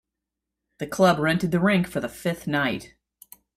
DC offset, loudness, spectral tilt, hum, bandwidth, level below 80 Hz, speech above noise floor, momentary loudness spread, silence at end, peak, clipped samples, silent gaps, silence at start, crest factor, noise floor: under 0.1%; -23 LUFS; -6 dB/octave; none; 15.5 kHz; -56 dBFS; 62 dB; 13 LU; 0.7 s; -6 dBFS; under 0.1%; none; 0.8 s; 18 dB; -85 dBFS